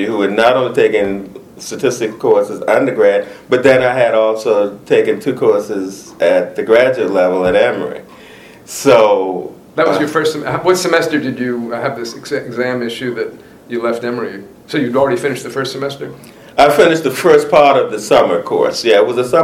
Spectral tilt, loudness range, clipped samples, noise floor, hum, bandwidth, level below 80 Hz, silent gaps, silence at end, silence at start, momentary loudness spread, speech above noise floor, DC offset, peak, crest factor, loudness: -4.5 dB/octave; 7 LU; 0.1%; -38 dBFS; none; 16 kHz; -52 dBFS; none; 0 s; 0 s; 13 LU; 25 dB; under 0.1%; 0 dBFS; 14 dB; -13 LUFS